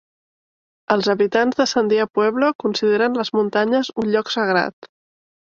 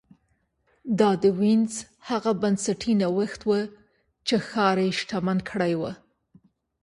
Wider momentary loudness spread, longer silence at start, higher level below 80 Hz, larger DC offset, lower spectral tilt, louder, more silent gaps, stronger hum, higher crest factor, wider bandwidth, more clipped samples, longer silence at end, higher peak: second, 3 LU vs 11 LU; about the same, 0.9 s vs 0.85 s; about the same, -64 dBFS vs -62 dBFS; neither; about the same, -4.5 dB/octave vs -5.5 dB/octave; first, -19 LUFS vs -25 LUFS; first, 2.55-2.59 s, 4.73-4.82 s vs none; neither; about the same, 18 dB vs 18 dB; second, 7.4 kHz vs 11.5 kHz; neither; second, 0.75 s vs 0.9 s; first, -2 dBFS vs -6 dBFS